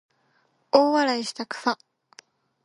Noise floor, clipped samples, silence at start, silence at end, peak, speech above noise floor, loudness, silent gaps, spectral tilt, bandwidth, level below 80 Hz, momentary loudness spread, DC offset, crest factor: -67 dBFS; under 0.1%; 0.75 s; 0.9 s; -2 dBFS; 45 dB; -24 LUFS; none; -3 dB/octave; 11.5 kHz; -80 dBFS; 11 LU; under 0.1%; 24 dB